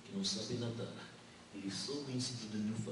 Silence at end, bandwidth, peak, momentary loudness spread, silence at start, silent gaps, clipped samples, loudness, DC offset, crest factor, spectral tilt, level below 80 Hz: 0 s; 11.5 kHz; -26 dBFS; 14 LU; 0 s; none; under 0.1%; -41 LUFS; under 0.1%; 16 dB; -4.5 dB/octave; -74 dBFS